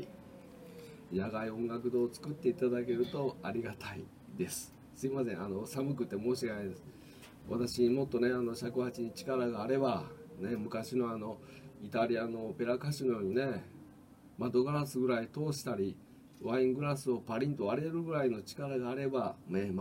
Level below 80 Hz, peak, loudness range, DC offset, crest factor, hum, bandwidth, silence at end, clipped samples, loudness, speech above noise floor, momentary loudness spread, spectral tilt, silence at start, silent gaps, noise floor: -68 dBFS; -18 dBFS; 4 LU; under 0.1%; 16 dB; none; 16 kHz; 0 s; under 0.1%; -36 LUFS; 23 dB; 17 LU; -6.5 dB/octave; 0 s; none; -57 dBFS